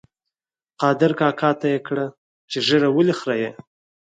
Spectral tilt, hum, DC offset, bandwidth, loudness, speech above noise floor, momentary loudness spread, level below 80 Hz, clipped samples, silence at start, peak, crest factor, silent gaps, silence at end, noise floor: -6 dB/octave; none; under 0.1%; 9.2 kHz; -20 LUFS; 70 dB; 10 LU; -70 dBFS; under 0.1%; 0.8 s; -2 dBFS; 18 dB; 2.18-2.48 s; 0.6 s; -90 dBFS